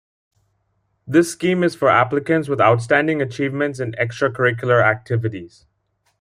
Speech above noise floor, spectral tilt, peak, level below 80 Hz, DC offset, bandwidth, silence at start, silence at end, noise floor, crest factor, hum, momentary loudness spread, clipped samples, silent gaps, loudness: 50 dB; -6 dB/octave; -2 dBFS; -60 dBFS; under 0.1%; 15 kHz; 1.05 s; 0.75 s; -68 dBFS; 18 dB; none; 8 LU; under 0.1%; none; -18 LUFS